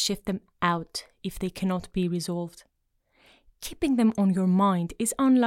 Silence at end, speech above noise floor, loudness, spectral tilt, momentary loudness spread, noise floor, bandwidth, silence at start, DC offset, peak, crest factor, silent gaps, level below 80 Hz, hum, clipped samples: 0 s; 45 dB; -27 LUFS; -5.5 dB/octave; 14 LU; -71 dBFS; 16.5 kHz; 0 s; under 0.1%; -8 dBFS; 18 dB; none; -52 dBFS; none; under 0.1%